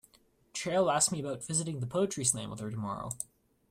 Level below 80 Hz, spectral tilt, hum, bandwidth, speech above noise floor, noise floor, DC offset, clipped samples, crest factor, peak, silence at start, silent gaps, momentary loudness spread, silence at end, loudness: -66 dBFS; -3.5 dB/octave; none; 16 kHz; 34 dB; -66 dBFS; under 0.1%; under 0.1%; 22 dB; -12 dBFS; 0.55 s; none; 12 LU; 0.45 s; -32 LUFS